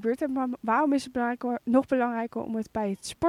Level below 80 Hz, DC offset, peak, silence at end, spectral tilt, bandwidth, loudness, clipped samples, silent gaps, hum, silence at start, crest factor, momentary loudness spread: -62 dBFS; under 0.1%; -10 dBFS; 0 s; -5.5 dB/octave; 14.5 kHz; -28 LUFS; under 0.1%; none; none; 0 s; 16 dB; 8 LU